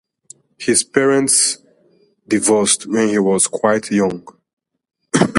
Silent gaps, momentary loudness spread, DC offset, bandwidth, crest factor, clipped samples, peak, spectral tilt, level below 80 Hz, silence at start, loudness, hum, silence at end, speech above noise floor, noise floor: 4.53-4.57 s; 8 LU; under 0.1%; 11.5 kHz; 18 dB; under 0.1%; 0 dBFS; -3 dB/octave; -58 dBFS; 0.6 s; -15 LUFS; none; 0 s; 40 dB; -56 dBFS